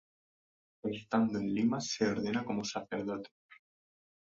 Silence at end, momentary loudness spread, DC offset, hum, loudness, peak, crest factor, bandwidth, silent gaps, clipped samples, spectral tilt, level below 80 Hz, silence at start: 0.8 s; 9 LU; under 0.1%; none; -34 LUFS; -16 dBFS; 20 dB; 7.8 kHz; 3.31-3.49 s; under 0.1%; -5 dB/octave; -70 dBFS; 0.85 s